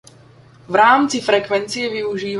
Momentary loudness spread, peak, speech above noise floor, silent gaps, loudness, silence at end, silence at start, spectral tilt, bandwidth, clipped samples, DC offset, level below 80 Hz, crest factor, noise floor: 10 LU; -2 dBFS; 29 dB; none; -16 LUFS; 0 s; 0.7 s; -3.5 dB/octave; 11.5 kHz; under 0.1%; under 0.1%; -60 dBFS; 16 dB; -46 dBFS